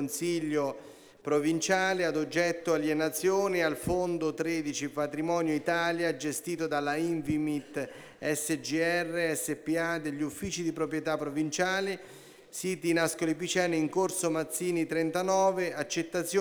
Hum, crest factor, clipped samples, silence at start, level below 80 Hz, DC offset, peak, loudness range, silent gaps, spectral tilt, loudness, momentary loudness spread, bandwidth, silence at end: none; 18 dB; under 0.1%; 0 s; -62 dBFS; under 0.1%; -14 dBFS; 3 LU; none; -4 dB/octave; -30 LUFS; 7 LU; over 20 kHz; 0 s